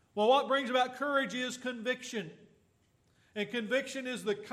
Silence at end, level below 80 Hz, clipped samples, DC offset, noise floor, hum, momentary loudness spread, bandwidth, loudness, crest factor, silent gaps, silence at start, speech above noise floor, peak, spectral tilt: 0 s; -82 dBFS; under 0.1%; under 0.1%; -71 dBFS; none; 12 LU; 14.5 kHz; -32 LUFS; 18 dB; none; 0.15 s; 38 dB; -14 dBFS; -3.5 dB/octave